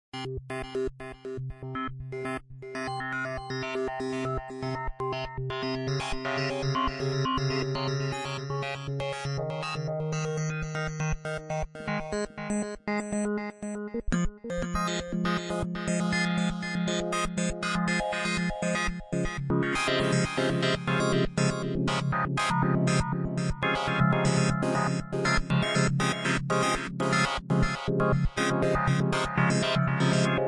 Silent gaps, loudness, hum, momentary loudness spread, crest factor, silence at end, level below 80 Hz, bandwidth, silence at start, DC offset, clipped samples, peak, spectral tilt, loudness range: none; -29 LUFS; none; 9 LU; 18 dB; 0 s; -42 dBFS; 11.5 kHz; 0.15 s; under 0.1%; under 0.1%; -10 dBFS; -5.5 dB/octave; 6 LU